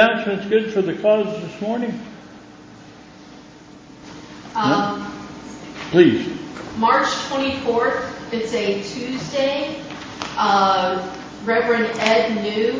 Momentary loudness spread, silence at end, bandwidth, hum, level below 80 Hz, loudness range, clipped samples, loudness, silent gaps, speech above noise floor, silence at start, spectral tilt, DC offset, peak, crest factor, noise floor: 17 LU; 0 s; 7.8 kHz; none; -54 dBFS; 7 LU; under 0.1%; -20 LUFS; none; 23 dB; 0 s; -5 dB/octave; under 0.1%; -2 dBFS; 20 dB; -43 dBFS